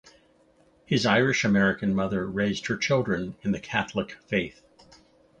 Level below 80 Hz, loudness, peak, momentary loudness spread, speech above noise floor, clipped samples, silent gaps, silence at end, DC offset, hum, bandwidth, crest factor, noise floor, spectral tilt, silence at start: -56 dBFS; -26 LUFS; -6 dBFS; 9 LU; 36 dB; under 0.1%; none; 0.9 s; under 0.1%; none; 8 kHz; 20 dB; -61 dBFS; -5.5 dB/octave; 0.9 s